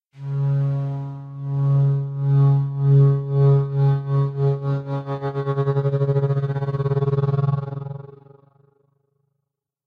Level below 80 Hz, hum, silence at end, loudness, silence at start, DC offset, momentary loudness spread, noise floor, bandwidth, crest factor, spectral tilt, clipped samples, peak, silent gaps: -56 dBFS; none; 1.7 s; -21 LUFS; 0.15 s; under 0.1%; 11 LU; -80 dBFS; 4.1 kHz; 12 dB; -11.5 dB/octave; under 0.1%; -8 dBFS; none